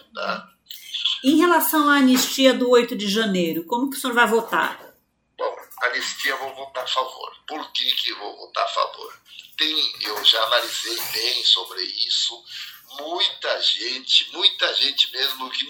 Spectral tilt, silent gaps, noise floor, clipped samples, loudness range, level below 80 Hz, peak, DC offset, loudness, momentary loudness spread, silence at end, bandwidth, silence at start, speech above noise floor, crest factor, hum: -2.5 dB/octave; none; -58 dBFS; under 0.1%; 7 LU; -74 dBFS; -2 dBFS; under 0.1%; -20 LUFS; 16 LU; 0 s; over 20 kHz; 0.15 s; 36 dB; 22 dB; none